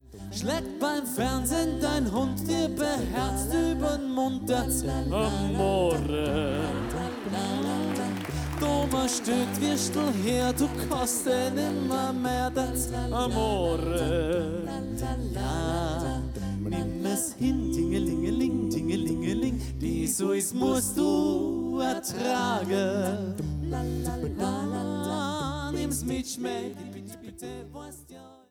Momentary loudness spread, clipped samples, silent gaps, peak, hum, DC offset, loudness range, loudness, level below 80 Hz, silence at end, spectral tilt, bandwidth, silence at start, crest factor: 6 LU; under 0.1%; none; -14 dBFS; none; under 0.1%; 4 LU; -28 LUFS; -40 dBFS; 0.15 s; -5 dB/octave; 19 kHz; 0.05 s; 14 dB